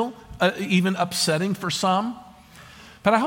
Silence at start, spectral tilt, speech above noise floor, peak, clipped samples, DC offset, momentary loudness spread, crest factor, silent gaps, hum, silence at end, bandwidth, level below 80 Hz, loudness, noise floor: 0 s; -4.5 dB/octave; 24 dB; -6 dBFS; under 0.1%; under 0.1%; 8 LU; 18 dB; none; none; 0 s; 17 kHz; -54 dBFS; -23 LUFS; -47 dBFS